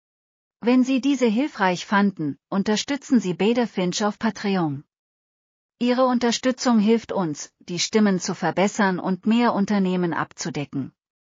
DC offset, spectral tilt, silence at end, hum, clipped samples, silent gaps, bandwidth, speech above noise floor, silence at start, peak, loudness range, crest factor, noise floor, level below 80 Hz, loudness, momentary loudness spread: under 0.1%; -5 dB/octave; 0.45 s; none; under 0.1%; 4.99-5.69 s; 7.6 kHz; over 68 dB; 0.65 s; -6 dBFS; 2 LU; 16 dB; under -90 dBFS; -66 dBFS; -22 LUFS; 9 LU